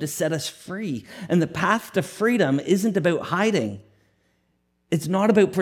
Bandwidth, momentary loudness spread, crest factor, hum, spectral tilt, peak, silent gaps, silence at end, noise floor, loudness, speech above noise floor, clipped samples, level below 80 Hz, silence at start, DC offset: 17 kHz; 11 LU; 18 dB; none; -5.5 dB/octave; -6 dBFS; none; 0 s; -69 dBFS; -23 LUFS; 47 dB; under 0.1%; -64 dBFS; 0 s; under 0.1%